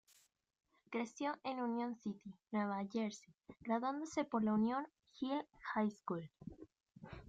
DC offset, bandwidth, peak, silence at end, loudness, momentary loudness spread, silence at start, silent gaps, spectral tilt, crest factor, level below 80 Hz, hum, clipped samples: under 0.1%; 8 kHz; -24 dBFS; 0 s; -41 LUFS; 18 LU; 0.9 s; none; -6 dB/octave; 18 dB; -74 dBFS; none; under 0.1%